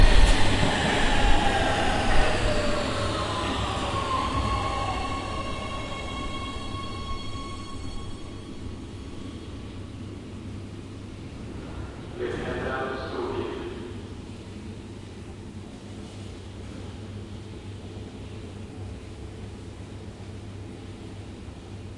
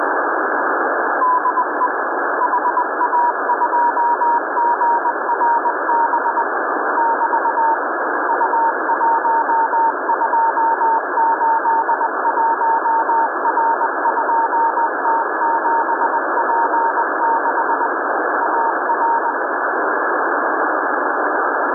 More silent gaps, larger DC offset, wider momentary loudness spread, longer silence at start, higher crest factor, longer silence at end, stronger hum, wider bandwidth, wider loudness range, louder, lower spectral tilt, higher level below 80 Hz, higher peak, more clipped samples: neither; neither; first, 17 LU vs 3 LU; about the same, 0 s vs 0 s; first, 22 dB vs 10 dB; about the same, 0 s vs 0 s; neither; first, 11.5 kHz vs 1.9 kHz; first, 15 LU vs 1 LU; second, -30 LUFS vs -17 LUFS; second, -5 dB/octave vs -10 dB/octave; first, -32 dBFS vs -90 dBFS; first, -4 dBFS vs -8 dBFS; neither